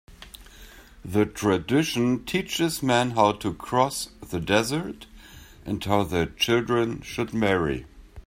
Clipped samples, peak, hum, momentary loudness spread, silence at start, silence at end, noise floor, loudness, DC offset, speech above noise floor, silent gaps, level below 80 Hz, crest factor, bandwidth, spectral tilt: under 0.1%; -4 dBFS; none; 19 LU; 0.1 s; 0.05 s; -47 dBFS; -25 LUFS; under 0.1%; 23 dB; none; -48 dBFS; 22 dB; 16 kHz; -5 dB/octave